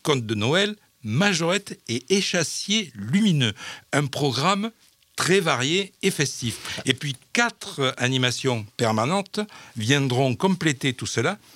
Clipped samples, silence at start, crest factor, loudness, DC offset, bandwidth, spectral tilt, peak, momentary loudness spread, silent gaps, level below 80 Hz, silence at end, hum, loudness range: under 0.1%; 0.05 s; 22 dB; -23 LUFS; under 0.1%; 16.5 kHz; -4 dB/octave; -2 dBFS; 8 LU; none; -68 dBFS; 0.2 s; none; 1 LU